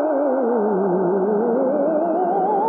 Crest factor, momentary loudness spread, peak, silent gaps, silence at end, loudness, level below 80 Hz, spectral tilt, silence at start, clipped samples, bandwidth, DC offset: 10 dB; 0 LU; -8 dBFS; none; 0 s; -19 LUFS; -84 dBFS; -12.5 dB/octave; 0 s; under 0.1%; 3.3 kHz; under 0.1%